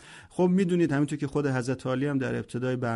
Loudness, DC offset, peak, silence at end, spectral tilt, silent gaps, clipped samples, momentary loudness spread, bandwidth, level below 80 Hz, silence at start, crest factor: -27 LUFS; under 0.1%; -14 dBFS; 0 s; -7.5 dB/octave; none; under 0.1%; 7 LU; 11.5 kHz; -60 dBFS; 0 s; 14 dB